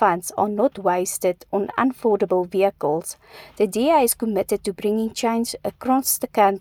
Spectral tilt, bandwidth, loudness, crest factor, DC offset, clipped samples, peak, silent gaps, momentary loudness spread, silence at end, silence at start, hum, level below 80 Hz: -4 dB/octave; over 20 kHz; -21 LUFS; 18 dB; under 0.1%; under 0.1%; -4 dBFS; none; 7 LU; 0 s; 0 s; none; -58 dBFS